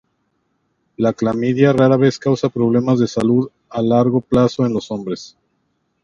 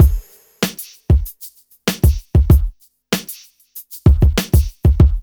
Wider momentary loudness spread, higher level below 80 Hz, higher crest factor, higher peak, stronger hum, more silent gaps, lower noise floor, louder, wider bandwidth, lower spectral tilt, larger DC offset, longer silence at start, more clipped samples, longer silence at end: second, 11 LU vs 21 LU; second, -50 dBFS vs -18 dBFS; about the same, 16 dB vs 16 dB; about the same, 0 dBFS vs 0 dBFS; neither; neither; first, -67 dBFS vs -41 dBFS; about the same, -17 LUFS vs -17 LUFS; second, 7.6 kHz vs over 20 kHz; first, -7.5 dB/octave vs -6 dB/octave; neither; first, 1 s vs 0 s; neither; first, 0.75 s vs 0 s